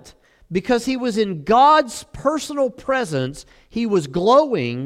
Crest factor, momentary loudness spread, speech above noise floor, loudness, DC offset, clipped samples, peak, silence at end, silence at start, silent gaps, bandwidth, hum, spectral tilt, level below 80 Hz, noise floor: 16 dB; 12 LU; 30 dB; -19 LUFS; under 0.1%; under 0.1%; -4 dBFS; 0 s; 0.05 s; none; 15 kHz; none; -5.5 dB/octave; -50 dBFS; -49 dBFS